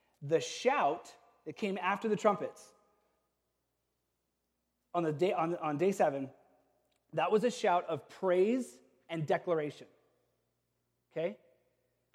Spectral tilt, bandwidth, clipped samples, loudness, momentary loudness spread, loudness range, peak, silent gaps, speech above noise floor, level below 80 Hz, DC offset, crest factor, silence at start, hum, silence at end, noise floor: -5.5 dB/octave; 14.5 kHz; under 0.1%; -33 LUFS; 13 LU; 6 LU; -14 dBFS; none; 51 dB; -86 dBFS; under 0.1%; 20 dB; 0.2 s; none; 0.8 s; -83 dBFS